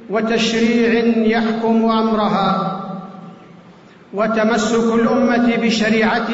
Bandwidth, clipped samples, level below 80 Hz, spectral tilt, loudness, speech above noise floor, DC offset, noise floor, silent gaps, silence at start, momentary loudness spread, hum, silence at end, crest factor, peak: 8 kHz; under 0.1%; -48 dBFS; -5 dB/octave; -16 LUFS; 28 dB; under 0.1%; -43 dBFS; none; 0 s; 8 LU; none; 0 s; 10 dB; -6 dBFS